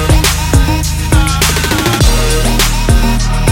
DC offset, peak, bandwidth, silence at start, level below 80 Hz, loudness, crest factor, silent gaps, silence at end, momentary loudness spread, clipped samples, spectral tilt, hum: under 0.1%; 0 dBFS; 17 kHz; 0 s; -12 dBFS; -11 LUFS; 10 dB; none; 0 s; 3 LU; under 0.1%; -4 dB/octave; none